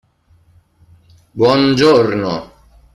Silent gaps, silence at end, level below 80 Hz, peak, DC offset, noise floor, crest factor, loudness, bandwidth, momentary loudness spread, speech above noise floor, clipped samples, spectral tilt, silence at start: none; 0.5 s; -48 dBFS; -2 dBFS; under 0.1%; -53 dBFS; 16 dB; -13 LUFS; 12 kHz; 14 LU; 41 dB; under 0.1%; -6 dB/octave; 1.35 s